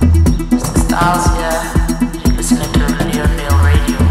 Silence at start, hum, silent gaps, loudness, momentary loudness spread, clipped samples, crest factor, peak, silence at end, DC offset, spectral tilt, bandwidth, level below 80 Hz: 0 s; none; none; -14 LUFS; 4 LU; under 0.1%; 12 dB; 0 dBFS; 0 s; under 0.1%; -5.5 dB/octave; 16 kHz; -16 dBFS